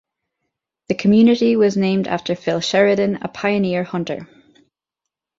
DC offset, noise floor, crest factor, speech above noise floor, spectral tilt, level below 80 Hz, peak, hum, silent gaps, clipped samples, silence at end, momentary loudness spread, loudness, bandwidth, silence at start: under 0.1%; -84 dBFS; 16 dB; 67 dB; -6 dB/octave; -58 dBFS; -4 dBFS; none; none; under 0.1%; 1.15 s; 11 LU; -18 LUFS; 7.6 kHz; 0.9 s